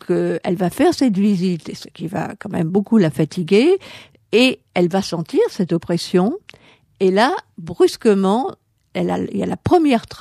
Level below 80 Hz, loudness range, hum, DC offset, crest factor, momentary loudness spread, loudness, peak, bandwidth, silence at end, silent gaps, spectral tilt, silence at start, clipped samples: -54 dBFS; 2 LU; none; under 0.1%; 16 dB; 11 LU; -18 LUFS; -2 dBFS; 14.5 kHz; 0 s; none; -6.5 dB/octave; 0.1 s; under 0.1%